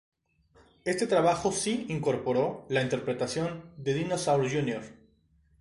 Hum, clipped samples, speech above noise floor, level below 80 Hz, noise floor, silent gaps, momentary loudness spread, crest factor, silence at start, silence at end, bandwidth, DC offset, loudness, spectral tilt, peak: none; under 0.1%; 37 dB; -62 dBFS; -65 dBFS; none; 10 LU; 18 dB; 0.85 s; 0.65 s; 11.5 kHz; under 0.1%; -29 LUFS; -5 dB/octave; -12 dBFS